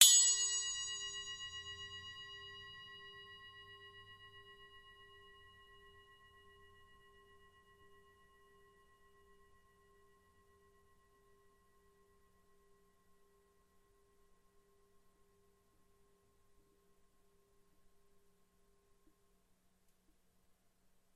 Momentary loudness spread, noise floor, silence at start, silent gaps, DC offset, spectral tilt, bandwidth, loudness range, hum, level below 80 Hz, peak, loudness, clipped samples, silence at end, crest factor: 27 LU; -75 dBFS; 0 s; none; under 0.1%; 3 dB/octave; 13 kHz; 25 LU; none; -76 dBFS; -8 dBFS; -34 LUFS; under 0.1%; 16.75 s; 36 dB